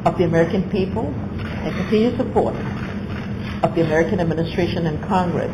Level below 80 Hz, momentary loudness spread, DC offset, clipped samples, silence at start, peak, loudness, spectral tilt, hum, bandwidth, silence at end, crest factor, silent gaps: -38 dBFS; 9 LU; under 0.1%; under 0.1%; 0 s; -6 dBFS; -21 LUFS; -7.5 dB/octave; none; 12 kHz; 0 s; 14 dB; none